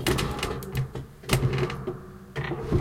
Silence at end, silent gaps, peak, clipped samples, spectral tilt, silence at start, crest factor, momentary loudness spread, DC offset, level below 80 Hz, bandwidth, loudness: 0 s; none; -8 dBFS; under 0.1%; -5.5 dB/octave; 0 s; 20 dB; 12 LU; under 0.1%; -40 dBFS; 17 kHz; -29 LUFS